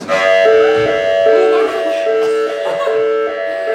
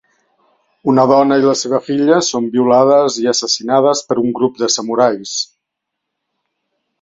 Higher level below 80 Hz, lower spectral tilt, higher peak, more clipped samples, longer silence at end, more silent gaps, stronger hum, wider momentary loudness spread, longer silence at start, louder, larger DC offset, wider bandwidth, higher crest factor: first, -54 dBFS vs -60 dBFS; about the same, -4 dB/octave vs -4 dB/octave; about the same, 0 dBFS vs 0 dBFS; neither; second, 0 s vs 1.6 s; neither; neither; about the same, 7 LU vs 7 LU; second, 0 s vs 0.85 s; about the same, -13 LUFS vs -14 LUFS; neither; first, 10 kHz vs 8 kHz; about the same, 12 dB vs 14 dB